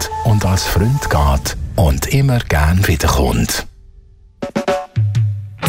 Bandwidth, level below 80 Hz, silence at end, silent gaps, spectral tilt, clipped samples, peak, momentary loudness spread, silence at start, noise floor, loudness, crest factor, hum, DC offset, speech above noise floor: 16.5 kHz; -22 dBFS; 0 s; none; -5 dB/octave; under 0.1%; -2 dBFS; 7 LU; 0 s; -43 dBFS; -16 LUFS; 14 dB; none; under 0.1%; 29 dB